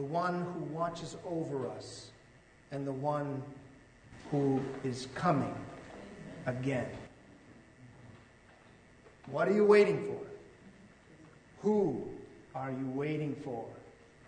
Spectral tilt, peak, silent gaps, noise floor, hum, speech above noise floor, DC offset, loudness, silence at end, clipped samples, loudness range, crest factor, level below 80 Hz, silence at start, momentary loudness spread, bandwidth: -7 dB/octave; -14 dBFS; none; -60 dBFS; none; 28 dB; under 0.1%; -34 LUFS; 0 s; under 0.1%; 9 LU; 22 dB; -66 dBFS; 0 s; 19 LU; 9.4 kHz